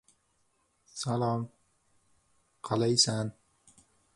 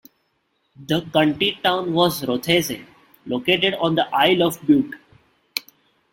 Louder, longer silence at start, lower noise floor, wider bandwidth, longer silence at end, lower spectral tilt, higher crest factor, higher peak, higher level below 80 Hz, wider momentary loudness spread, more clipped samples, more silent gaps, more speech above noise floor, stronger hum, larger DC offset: second, -29 LUFS vs -20 LUFS; first, 0.95 s vs 0.8 s; first, -73 dBFS vs -69 dBFS; second, 11.5 kHz vs 17 kHz; first, 0.85 s vs 0.5 s; about the same, -4 dB/octave vs -4.5 dB/octave; first, 24 dB vs 18 dB; second, -10 dBFS vs -2 dBFS; second, -68 dBFS vs -58 dBFS; first, 20 LU vs 12 LU; neither; neither; second, 44 dB vs 49 dB; neither; neither